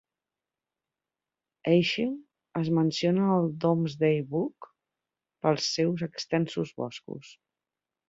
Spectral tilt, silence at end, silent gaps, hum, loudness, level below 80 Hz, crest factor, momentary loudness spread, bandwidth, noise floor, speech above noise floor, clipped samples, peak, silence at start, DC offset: -6 dB/octave; 0.75 s; none; none; -28 LUFS; -70 dBFS; 20 dB; 12 LU; 7.8 kHz; under -90 dBFS; over 63 dB; under 0.1%; -10 dBFS; 1.65 s; under 0.1%